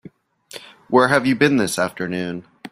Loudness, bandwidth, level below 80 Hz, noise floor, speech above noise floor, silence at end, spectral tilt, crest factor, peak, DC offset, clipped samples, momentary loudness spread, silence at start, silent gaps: -18 LUFS; 15.5 kHz; -58 dBFS; -45 dBFS; 27 dB; 0.05 s; -5 dB/octave; 20 dB; 0 dBFS; under 0.1%; under 0.1%; 22 LU; 0.55 s; none